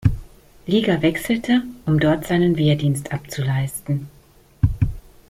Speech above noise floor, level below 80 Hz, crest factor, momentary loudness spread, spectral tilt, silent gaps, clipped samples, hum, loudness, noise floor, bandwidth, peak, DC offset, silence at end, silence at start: 32 dB; -36 dBFS; 18 dB; 9 LU; -6.5 dB/octave; none; under 0.1%; none; -21 LUFS; -51 dBFS; 16 kHz; -2 dBFS; under 0.1%; 0.3 s; 0 s